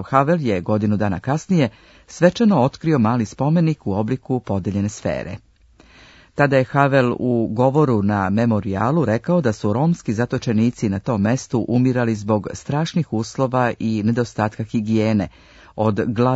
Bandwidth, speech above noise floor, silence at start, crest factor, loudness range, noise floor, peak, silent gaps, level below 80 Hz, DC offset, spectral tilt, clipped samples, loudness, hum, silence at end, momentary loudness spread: 8 kHz; 32 dB; 0 s; 18 dB; 3 LU; -50 dBFS; 0 dBFS; none; -52 dBFS; under 0.1%; -7.5 dB/octave; under 0.1%; -19 LUFS; none; 0 s; 7 LU